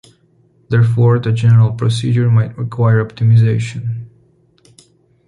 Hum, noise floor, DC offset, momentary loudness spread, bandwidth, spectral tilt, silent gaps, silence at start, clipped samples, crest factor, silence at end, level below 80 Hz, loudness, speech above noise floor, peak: none; -54 dBFS; under 0.1%; 10 LU; 10.5 kHz; -8 dB/octave; none; 0.7 s; under 0.1%; 12 dB; 1.2 s; -46 dBFS; -14 LUFS; 41 dB; -2 dBFS